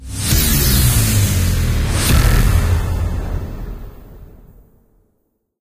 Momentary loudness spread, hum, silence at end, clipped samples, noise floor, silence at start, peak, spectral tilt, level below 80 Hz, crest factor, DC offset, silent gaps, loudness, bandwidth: 14 LU; none; 1.35 s; under 0.1%; -66 dBFS; 0 s; 0 dBFS; -4 dB/octave; -20 dBFS; 16 dB; under 0.1%; none; -16 LUFS; 16 kHz